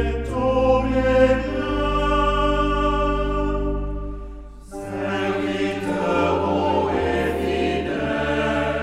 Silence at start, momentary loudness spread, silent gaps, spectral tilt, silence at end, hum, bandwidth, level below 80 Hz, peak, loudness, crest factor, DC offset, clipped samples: 0 s; 11 LU; none; -6.5 dB/octave; 0 s; none; 12.5 kHz; -30 dBFS; -4 dBFS; -21 LUFS; 16 dB; under 0.1%; under 0.1%